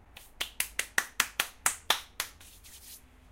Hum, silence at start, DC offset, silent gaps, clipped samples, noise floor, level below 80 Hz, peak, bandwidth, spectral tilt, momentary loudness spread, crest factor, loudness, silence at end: none; 0.15 s; under 0.1%; none; under 0.1%; -52 dBFS; -58 dBFS; -2 dBFS; 17 kHz; 1 dB/octave; 21 LU; 34 dB; -31 LUFS; 0.35 s